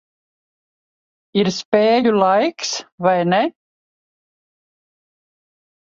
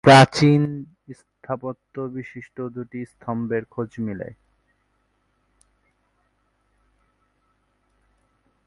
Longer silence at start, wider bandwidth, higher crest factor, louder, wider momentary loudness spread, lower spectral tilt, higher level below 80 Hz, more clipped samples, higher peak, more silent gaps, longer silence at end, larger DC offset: first, 1.35 s vs 0.05 s; second, 7.8 kHz vs 11.5 kHz; about the same, 18 dB vs 22 dB; first, -17 LUFS vs -22 LUFS; second, 9 LU vs 22 LU; about the same, -5 dB/octave vs -6 dB/octave; second, -66 dBFS vs -58 dBFS; neither; about the same, -2 dBFS vs 0 dBFS; first, 1.65-1.72 s, 2.92-2.98 s vs none; second, 2.45 s vs 4.4 s; neither